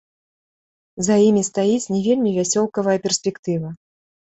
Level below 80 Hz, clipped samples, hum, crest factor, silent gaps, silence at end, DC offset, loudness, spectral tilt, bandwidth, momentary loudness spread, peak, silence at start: -60 dBFS; under 0.1%; none; 16 dB; 3.39-3.43 s; 0.55 s; under 0.1%; -19 LUFS; -5 dB/octave; 8.2 kHz; 10 LU; -6 dBFS; 0.95 s